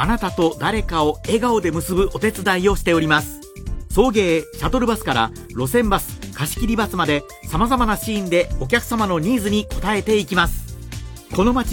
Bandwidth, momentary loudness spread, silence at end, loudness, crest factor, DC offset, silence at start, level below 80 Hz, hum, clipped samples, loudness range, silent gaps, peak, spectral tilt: 17 kHz; 9 LU; 0 s; -19 LUFS; 18 dB; under 0.1%; 0 s; -30 dBFS; none; under 0.1%; 2 LU; none; -2 dBFS; -5 dB/octave